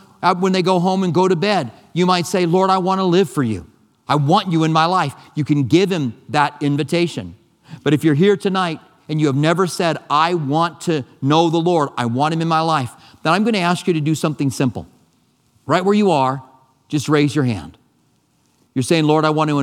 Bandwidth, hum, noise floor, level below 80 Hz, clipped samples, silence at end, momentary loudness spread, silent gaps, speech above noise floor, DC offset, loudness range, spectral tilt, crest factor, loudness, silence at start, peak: 15 kHz; none; -60 dBFS; -58 dBFS; under 0.1%; 0 s; 9 LU; none; 44 dB; under 0.1%; 3 LU; -6 dB/octave; 18 dB; -17 LUFS; 0.2 s; 0 dBFS